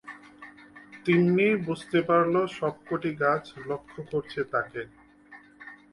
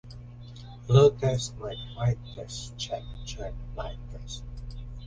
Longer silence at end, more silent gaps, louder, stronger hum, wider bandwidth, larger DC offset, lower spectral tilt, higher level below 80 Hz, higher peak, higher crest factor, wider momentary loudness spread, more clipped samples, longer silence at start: first, 0.2 s vs 0 s; neither; about the same, -27 LUFS vs -28 LUFS; neither; first, 11.5 kHz vs 9.8 kHz; neither; first, -7.5 dB/octave vs -6 dB/octave; second, -66 dBFS vs -42 dBFS; second, -12 dBFS vs -8 dBFS; about the same, 18 dB vs 22 dB; about the same, 24 LU vs 23 LU; neither; about the same, 0.05 s vs 0.05 s